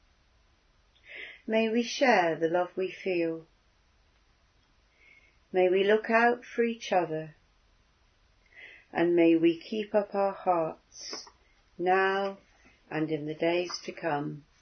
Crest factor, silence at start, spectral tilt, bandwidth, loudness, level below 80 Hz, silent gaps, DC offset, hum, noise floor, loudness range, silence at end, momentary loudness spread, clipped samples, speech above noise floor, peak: 20 dB; 1.1 s; -5 dB/octave; 6.6 kHz; -28 LUFS; -70 dBFS; none; under 0.1%; none; -66 dBFS; 3 LU; 0.2 s; 18 LU; under 0.1%; 38 dB; -10 dBFS